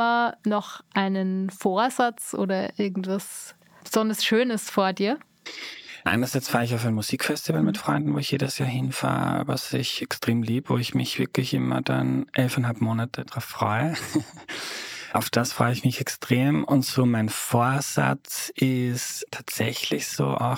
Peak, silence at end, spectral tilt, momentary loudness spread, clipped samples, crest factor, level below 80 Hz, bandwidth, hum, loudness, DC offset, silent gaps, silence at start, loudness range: -4 dBFS; 0 s; -5 dB/octave; 9 LU; under 0.1%; 20 dB; -64 dBFS; 18 kHz; none; -25 LUFS; under 0.1%; none; 0 s; 3 LU